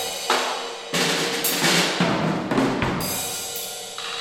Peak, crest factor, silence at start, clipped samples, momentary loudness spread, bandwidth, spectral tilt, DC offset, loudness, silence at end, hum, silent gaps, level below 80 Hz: -4 dBFS; 20 dB; 0 s; under 0.1%; 11 LU; 16.5 kHz; -3 dB/octave; under 0.1%; -22 LUFS; 0 s; none; none; -52 dBFS